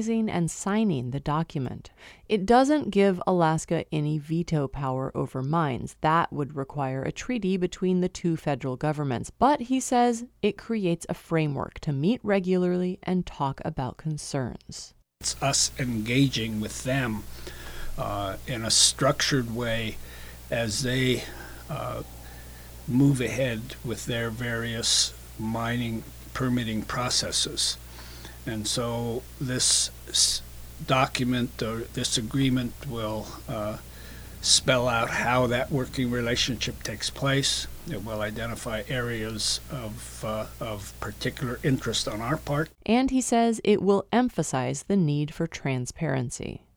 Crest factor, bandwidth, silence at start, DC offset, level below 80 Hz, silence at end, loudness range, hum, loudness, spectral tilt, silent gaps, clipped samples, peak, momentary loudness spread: 22 dB; over 20 kHz; 0 s; under 0.1%; -46 dBFS; 0.2 s; 4 LU; none; -26 LUFS; -4 dB/octave; none; under 0.1%; -4 dBFS; 13 LU